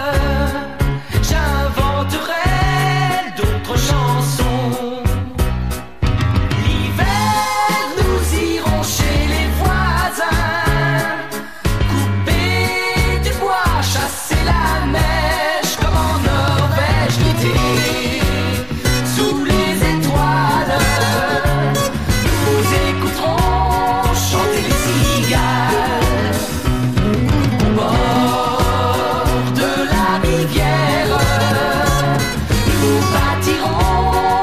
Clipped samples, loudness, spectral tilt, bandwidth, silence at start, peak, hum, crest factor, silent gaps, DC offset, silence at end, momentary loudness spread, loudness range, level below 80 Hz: under 0.1%; -16 LUFS; -5 dB/octave; 15.5 kHz; 0 s; -2 dBFS; none; 12 dB; none; 2%; 0 s; 4 LU; 2 LU; -22 dBFS